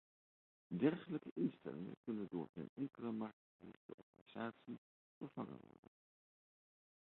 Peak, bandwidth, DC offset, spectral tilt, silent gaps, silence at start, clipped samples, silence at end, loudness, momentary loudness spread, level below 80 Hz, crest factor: -24 dBFS; 4.2 kHz; under 0.1%; -7 dB/octave; 1.31-1.36 s, 1.97-2.04 s, 2.49-2.53 s, 2.69-2.76 s, 3.33-3.59 s, 3.77-4.13 s, 4.21-4.26 s, 4.78-5.21 s; 0.7 s; under 0.1%; 1.5 s; -46 LUFS; 21 LU; -84 dBFS; 24 dB